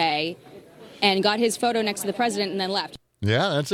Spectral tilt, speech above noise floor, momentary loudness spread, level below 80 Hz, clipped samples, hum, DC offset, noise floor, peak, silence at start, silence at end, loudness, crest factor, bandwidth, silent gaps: -4 dB/octave; 22 dB; 10 LU; -64 dBFS; under 0.1%; none; under 0.1%; -45 dBFS; -4 dBFS; 0 s; 0 s; -24 LUFS; 20 dB; 17 kHz; none